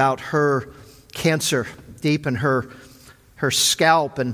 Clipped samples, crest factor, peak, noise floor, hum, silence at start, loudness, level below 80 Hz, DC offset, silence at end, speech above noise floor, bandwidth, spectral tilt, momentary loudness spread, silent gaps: under 0.1%; 18 dB; -2 dBFS; -48 dBFS; none; 0 s; -20 LUFS; -52 dBFS; under 0.1%; 0 s; 28 dB; 16 kHz; -3.5 dB/octave; 14 LU; none